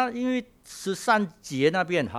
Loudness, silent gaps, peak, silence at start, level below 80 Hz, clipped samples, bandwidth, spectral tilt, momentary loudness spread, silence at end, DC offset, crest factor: -26 LUFS; none; -6 dBFS; 0 s; -64 dBFS; under 0.1%; 14.5 kHz; -5 dB/octave; 10 LU; 0 s; under 0.1%; 20 dB